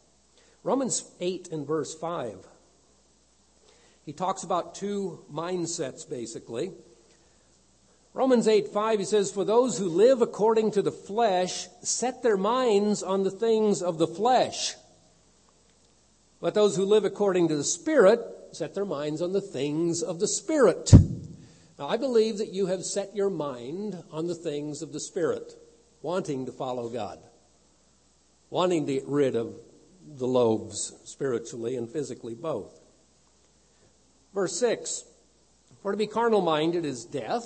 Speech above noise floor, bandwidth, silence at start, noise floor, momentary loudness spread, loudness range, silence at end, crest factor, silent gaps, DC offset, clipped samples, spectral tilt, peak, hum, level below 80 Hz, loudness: 38 dB; 8.8 kHz; 0.65 s; -64 dBFS; 13 LU; 11 LU; 0 s; 26 dB; none; under 0.1%; under 0.1%; -5.5 dB/octave; -2 dBFS; none; -46 dBFS; -27 LUFS